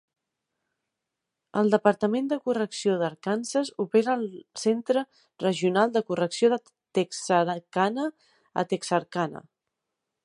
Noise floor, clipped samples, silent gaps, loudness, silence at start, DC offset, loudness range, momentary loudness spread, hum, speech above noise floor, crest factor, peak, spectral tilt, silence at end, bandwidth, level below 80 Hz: -85 dBFS; under 0.1%; none; -26 LUFS; 1.55 s; under 0.1%; 2 LU; 8 LU; none; 59 dB; 22 dB; -4 dBFS; -5 dB/octave; 0.85 s; 11.5 kHz; -76 dBFS